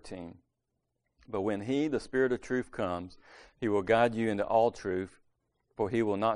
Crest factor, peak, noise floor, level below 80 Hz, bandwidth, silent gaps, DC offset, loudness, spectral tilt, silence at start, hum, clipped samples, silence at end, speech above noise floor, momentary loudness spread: 20 dB; -12 dBFS; -83 dBFS; -62 dBFS; 10.5 kHz; none; under 0.1%; -31 LUFS; -6.5 dB/octave; 0.05 s; none; under 0.1%; 0 s; 52 dB; 17 LU